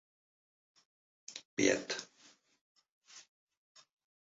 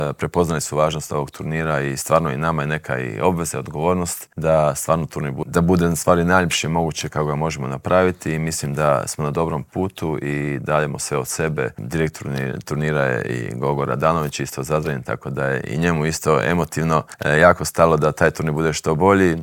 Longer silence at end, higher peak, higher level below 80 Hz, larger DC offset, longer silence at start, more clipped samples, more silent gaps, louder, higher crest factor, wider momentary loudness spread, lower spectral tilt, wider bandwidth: first, 1.1 s vs 0 s; second, -14 dBFS vs 0 dBFS; second, -80 dBFS vs -46 dBFS; neither; first, 1.3 s vs 0 s; neither; first, 1.45-1.57 s, 2.61-2.76 s, 2.89-3.02 s vs none; second, -34 LUFS vs -20 LUFS; first, 28 dB vs 20 dB; first, 25 LU vs 9 LU; second, -2.5 dB/octave vs -5.5 dB/octave; second, 7.6 kHz vs 19 kHz